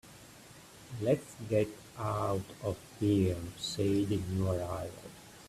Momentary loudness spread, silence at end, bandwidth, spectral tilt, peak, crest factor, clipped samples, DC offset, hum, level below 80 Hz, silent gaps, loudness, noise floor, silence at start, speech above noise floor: 22 LU; 0 s; 14.5 kHz; -6.5 dB/octave; -16 dBFS; 18 dB; under 0.1%; under 0.1%; none; -60 dBFS; none; -34 LUFS; -54 dBFS; 0.05 s; 21 dB